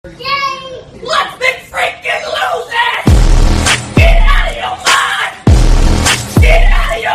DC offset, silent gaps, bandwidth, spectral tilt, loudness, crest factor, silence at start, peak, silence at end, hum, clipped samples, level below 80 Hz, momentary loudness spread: under 0.1%; none; 14 kHz; -4 dB/octave; -12 LUFS; 10 dB; 0.05 s; 0 dBFS; 0 s; none; 0.5%; -12 dBFS; 7 LU